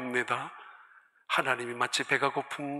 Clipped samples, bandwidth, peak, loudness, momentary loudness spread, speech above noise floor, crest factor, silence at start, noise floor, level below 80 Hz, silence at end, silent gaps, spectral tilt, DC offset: under 0.1%; 14.5 kHz; -10 dBFS; -30 LUFS; 9 LU; 28 dB; 22 dB; 0 s; -59 dBFS; -84 dBFS; 0 s; none; -3 dB/octave; under 0.1%